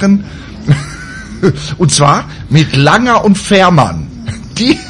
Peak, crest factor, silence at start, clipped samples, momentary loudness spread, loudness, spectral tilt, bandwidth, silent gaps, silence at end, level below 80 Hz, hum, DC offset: 0 dBFS; 10 dB; 0 s; 0.4%; 16 LU; -10 LUFS; -5 dB/octave; 11.5 kHz; none; 0 s; -34 dBFS; none; under 0.1%